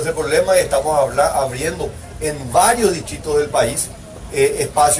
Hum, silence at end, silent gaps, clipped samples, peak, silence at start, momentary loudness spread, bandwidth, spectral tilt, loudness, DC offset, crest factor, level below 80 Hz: none; 0 s; none; under 0.1%; -2 dBFS; 0 s; 11 LU; 11 kHz; -3.5 dB/octave; -17 LUFS; under 0.1%; 14 dB; -38 dBFS